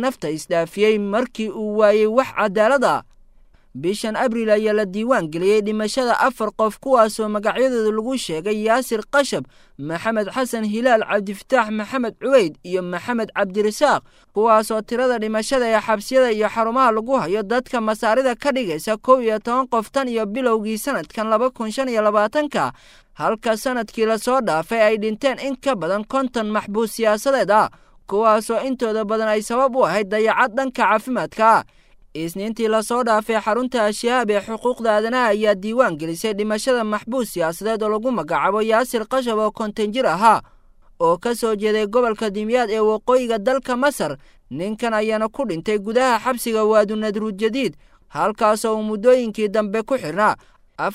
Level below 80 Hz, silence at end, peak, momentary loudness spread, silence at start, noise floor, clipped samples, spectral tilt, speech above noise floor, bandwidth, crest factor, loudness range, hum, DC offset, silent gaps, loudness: -52 dBFS; 0 s; -2 dBFS; 7 LU; 0 s; -50 dBFS; under 0.1%; -4.5 dB/octave; 31 dB; 16 kHz; 18 dB; 2 LU; none; under 0.1%; none; -20 LUFS